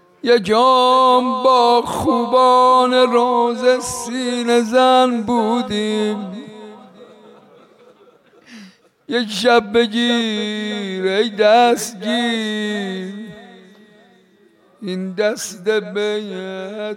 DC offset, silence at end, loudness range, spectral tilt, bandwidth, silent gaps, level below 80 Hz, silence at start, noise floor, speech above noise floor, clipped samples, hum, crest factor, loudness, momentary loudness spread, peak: under 0.1%; 0 s; 12 LU; -4 dB/octave; 16.5 kHz; none; -58 dBFS; 0.25 s; -53 dBFS; 37 dB; under 0.1%; none; 14 dB; -16 LUFS; 15 LU; -4 dBFS